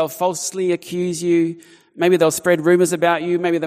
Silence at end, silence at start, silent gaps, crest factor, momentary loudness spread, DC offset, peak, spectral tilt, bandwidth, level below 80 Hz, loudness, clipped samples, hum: 0 s; 0 s; none; 16 dB; 7 LU; under 0.1%; -2 dBFS; -5 dB/octave; 15.5 kHz; -66 dBFS; -18 LUFS; under 0.1%; none